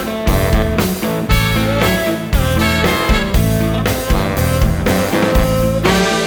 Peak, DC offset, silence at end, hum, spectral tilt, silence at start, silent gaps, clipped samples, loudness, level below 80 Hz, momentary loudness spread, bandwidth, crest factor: 0 dBFS; under 0.1%; 0 s; none; -5 dB/octave; 0 s; none; under 0.1%; -15 LUFS; -20 dBFS; 3 LU; over 20 kHz; 14 dB